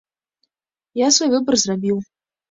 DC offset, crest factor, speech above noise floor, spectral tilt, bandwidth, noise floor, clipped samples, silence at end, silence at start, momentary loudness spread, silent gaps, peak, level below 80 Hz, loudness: under 0.1%; 18 dB; 68 dB; -3 dB/octave; 8 kHz; -85 dBFS; under 0.1%; 0.5 s; 0.95 s; 10 LU; none; -2 dBFS; -62 dBFS; -18 LUFS